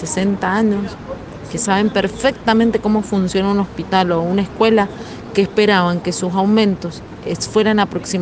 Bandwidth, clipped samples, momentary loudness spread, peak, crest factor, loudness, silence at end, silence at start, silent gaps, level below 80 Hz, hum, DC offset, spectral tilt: 9.6 kHz; under 0.1%; 12 LU; 0 dBFS; 16 dB; -17 LUFS; 0 s; 0 s; none; -44 dBFS; none; under 0.1%; -5 dB/octave